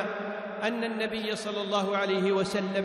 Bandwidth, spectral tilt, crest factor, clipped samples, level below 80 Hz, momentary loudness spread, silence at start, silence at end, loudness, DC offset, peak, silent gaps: 13 kHz; -5 dB/octave; 16 dB; under 0.1%; -68 dBFS; 6 LU; 0 s; 0 s; -29 LUFS; under 0.1%; -14 dBFS; none